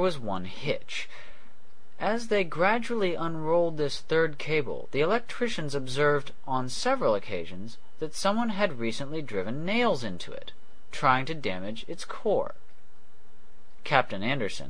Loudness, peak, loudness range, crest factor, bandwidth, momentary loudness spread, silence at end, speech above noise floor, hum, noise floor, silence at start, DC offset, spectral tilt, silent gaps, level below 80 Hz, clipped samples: -29 LUFS; -4 dBFS; 4 LU; 26 dB; 10.5 kHz; 13 LU; 0 s; 33 dB; none; -62 dBFS; 0 s; 3%; -5 dB/octave; none; -58 dBFS; under 0.1%